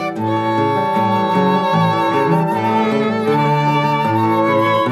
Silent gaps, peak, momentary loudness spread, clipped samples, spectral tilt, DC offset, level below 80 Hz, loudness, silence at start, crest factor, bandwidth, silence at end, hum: none; -4 dBFS; 2 LU; under 0.1%; -7.5 dB/octave; under 0.1%; -68 dBFS; -16 LUFS; 0 s; 12 dB; 15.5 kHz; 0 s; none